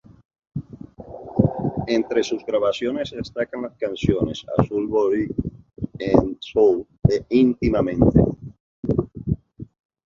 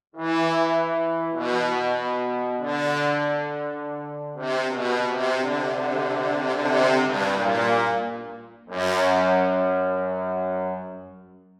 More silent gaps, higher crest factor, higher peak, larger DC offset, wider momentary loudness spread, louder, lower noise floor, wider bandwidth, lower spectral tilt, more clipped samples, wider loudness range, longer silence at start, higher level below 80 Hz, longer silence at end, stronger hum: first, 8.60-8.83 s vs none; about the same, 20 dB vs 16 dB; first, -2 dBFS vs -8 dBFS; neither; first, 17 LU vs 11 LU; about the same, -22 LUFS vs -24 LUFS; second, -40 dBFS vs -48 dBFS; second, 7.6 kHz vs 13.5 kHz; first, -8 dB/octave vs -5 dB/octave; neither; about the same, 4 LU vs 3 LU; first, 0.55 s vs 0.15 s; first, -38 dBFS vs -72 dBFS; first, 0.4 s vs 0.25 s; neither